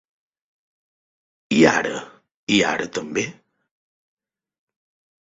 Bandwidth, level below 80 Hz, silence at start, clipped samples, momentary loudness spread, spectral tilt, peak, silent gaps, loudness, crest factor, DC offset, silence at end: 8 kHz; -60 dBFS; 1.5 s; under 0.1%; 15 LU; -4 dB/octave; -2 dBFS; 2.34-2.47 s; -20 LUFS; 24 dB; under 0.1%; 1.9 s